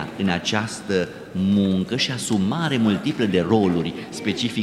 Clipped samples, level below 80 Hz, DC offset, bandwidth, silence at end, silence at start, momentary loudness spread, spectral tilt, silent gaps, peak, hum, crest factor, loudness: under 0.1%; -54 dBFS; under 0.1%; 13 kHz; 0 s; 0 s; 6 LU; -5.5 dB/octave; none; -4 dBFS; none; 18 dB; -22 LUFS